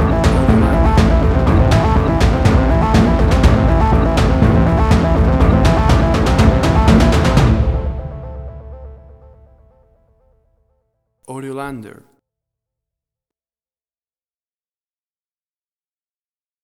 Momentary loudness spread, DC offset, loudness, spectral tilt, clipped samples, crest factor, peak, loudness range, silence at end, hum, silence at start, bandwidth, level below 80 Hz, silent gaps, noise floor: 16 LU; under 0.1%; -13 LUFS; -7 dB/octave; under 0.1%; 14 dB; 0 dBFS; 21 LU; 4.75 s; none; 0 s; 12.5 kHz; -18 dBFS; none; under -90 dBFS